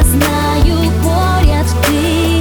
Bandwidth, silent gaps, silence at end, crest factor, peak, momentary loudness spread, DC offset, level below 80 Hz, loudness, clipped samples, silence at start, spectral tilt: over 20 kHz; none; 0 s; 10 dB; 0 dBFS; 1 LU; under 0.1%; -16 dBFS; -13 LUFS; under 0.1%; 0 s; -5.5 dB/octave